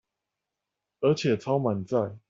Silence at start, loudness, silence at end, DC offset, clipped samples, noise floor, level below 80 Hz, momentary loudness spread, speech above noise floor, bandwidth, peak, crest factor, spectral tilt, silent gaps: 1 s; -27 LUFS; 0.1 s; under 0.1%; under 0.1%; -86 dBFS; -68 dBFS; 4 LU; 60 dB; 7.6 kHz; -12 dBFS; 18 dB; -7 dB/octave; none